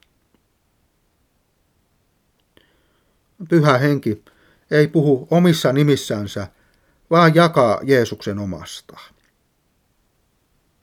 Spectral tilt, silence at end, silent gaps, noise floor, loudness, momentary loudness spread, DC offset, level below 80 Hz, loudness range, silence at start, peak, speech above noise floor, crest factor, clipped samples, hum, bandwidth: -6.5 dB/octave; 1.8 s; none; -65 dBFS; -17 LUFS; 17 LU; under 0.1%; -60 dBFS; 6 LU; 3.4 s; 0 dBFS; 48 dB; 20 dB; under 0.1%; none; 16 kHz